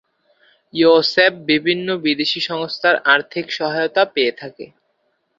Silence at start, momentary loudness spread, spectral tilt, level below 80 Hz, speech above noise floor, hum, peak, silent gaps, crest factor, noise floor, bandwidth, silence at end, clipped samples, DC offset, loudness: 0.75 s; 9 LU; -5 dB/octave; -66 dBFS; 50 dB; none; 0 dBFS; none; 18 dB; -67 dBFS; 7.6 kHz; 0.75 s; under 0.1%; under 0.1%; -17 LUFS